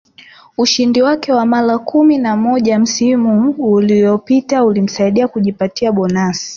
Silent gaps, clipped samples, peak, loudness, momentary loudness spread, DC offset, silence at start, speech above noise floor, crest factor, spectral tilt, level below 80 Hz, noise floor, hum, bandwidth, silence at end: none; under 0.1%; -2 dBFS; -13 LUFS; 5 LU; under 0.1%; 0.6 s; 30 dB; 12 dB; -5 dB/octave; -54 dBFS; -42 dBFS; none; 7.4 kHz; 0 s